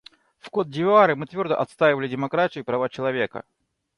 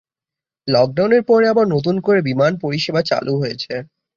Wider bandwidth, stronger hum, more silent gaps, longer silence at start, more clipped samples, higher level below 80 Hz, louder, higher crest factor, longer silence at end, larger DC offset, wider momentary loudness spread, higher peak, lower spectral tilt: first, 11 kHz vs 7.2 kHz; neither; neither; second, 0.45 s vs 0.65 s; neither; second, -64 dBFS vs -56 dBFS; second, -23 LUFS vs -17 LUFS; about the same, 20 dB vs 16 dB; first, 0.55 s vs 0.3 s; neither; about the same, 11 LU vs 11 LU; about the same, -4 dBFS vs -2 dBFS; about the same, -7 dB/octave vs -6.5 dB/octave